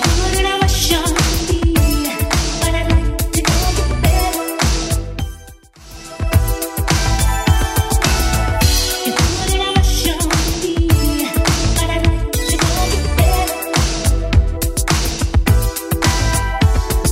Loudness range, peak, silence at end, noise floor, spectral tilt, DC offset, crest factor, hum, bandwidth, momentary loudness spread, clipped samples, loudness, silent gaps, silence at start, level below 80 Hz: 3 LU; 0 dBFS; 0 s; -39 dBFS; -4 dB/octave; under 0.1%; 16 dB; none; 16.5 kHz; 4 LU; under 0.1%; -16 LUFS; none; 0 s; -18 dBFS